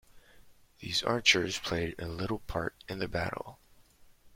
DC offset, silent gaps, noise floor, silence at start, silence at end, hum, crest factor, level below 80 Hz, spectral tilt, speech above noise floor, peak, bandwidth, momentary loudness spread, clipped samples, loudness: under 0.1%; none; -59 dBFS; 0.15 s; 0.05 s; none; 26 dB; -54 dBFS; -3.5 dB/octave; 27 dB; -8 dBFS; 16.5 kHz; 14 LU; under 0.1%; -31 LUFS